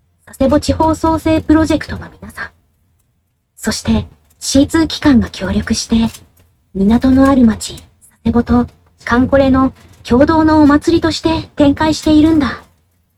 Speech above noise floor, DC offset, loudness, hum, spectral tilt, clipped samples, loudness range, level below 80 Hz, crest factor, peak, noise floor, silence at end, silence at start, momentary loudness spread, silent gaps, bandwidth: 50 dB; under 0.1%; -13 LUFS; none; -5.5 dB/octave; under 0.1%; 6 LU; -30 dBFS; 14 dB; 0 dBFS; -62 dBFS; 0.6 s; 0.4 s; 17 LU; none; 14.5 kHz